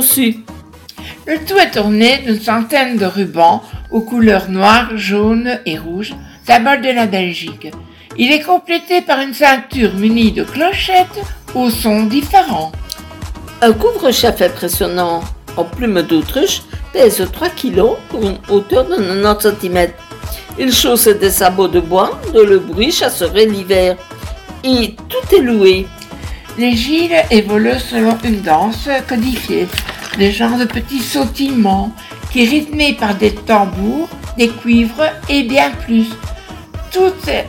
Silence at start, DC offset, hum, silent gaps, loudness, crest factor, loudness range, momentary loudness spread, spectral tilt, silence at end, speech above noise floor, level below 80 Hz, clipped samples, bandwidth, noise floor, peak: 0 s; under 0.1%; none; none; -13 LUFS; 14 dB; 3 LU; 14 LU; -4 dB/octave; 0 s; 21 dB; -32 dBFS; 0.4%; 18 kHz; -34 dBFS; 0 dBFS